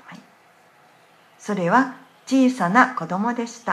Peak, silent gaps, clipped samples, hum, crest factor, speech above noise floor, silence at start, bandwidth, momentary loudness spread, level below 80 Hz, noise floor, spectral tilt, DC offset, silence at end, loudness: 0 dBFS; none; under 0.1%; none; 22 dB; 34 dB; 0.1 s; 12 kHz; 12 LU; -76 dBFS; -54 dBFS; -5.5 dB/octave; under 0.1%; 0 s; -20 LUFS